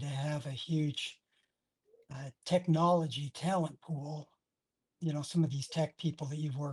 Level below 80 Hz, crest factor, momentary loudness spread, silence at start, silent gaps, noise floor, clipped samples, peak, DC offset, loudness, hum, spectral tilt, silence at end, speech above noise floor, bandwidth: -74 dBFS; 18 dB; 15 LU; 0 s; none; -89 dBFS; under 0.1%; -16 dBFS; under 0.1%; -35 LUFS; none; -6.5 dB/octave; 0 s; 55 dB; 11.5 kHz